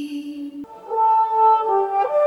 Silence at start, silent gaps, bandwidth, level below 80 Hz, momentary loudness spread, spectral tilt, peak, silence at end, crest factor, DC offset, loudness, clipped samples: 0 s; none; 11.5 kHz; -70 dBFS; 17 LU; -5 dB/octave; -8 dBFS; 0 s; 12 dB; under 0.1%; -18 LUFS; under 0.1%